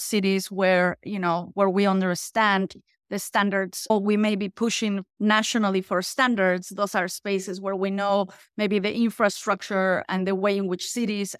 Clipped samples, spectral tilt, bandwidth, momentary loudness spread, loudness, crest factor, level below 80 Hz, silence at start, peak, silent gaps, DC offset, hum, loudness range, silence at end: under 0.1%; -4.5 dB/octave; 15.5 kHz; 7 LU; -24 LUFS; 18 dB; -68 dBFS; 0 s; -6 dBFS; none; under 0.1%; none; 2 LU; 0.05 s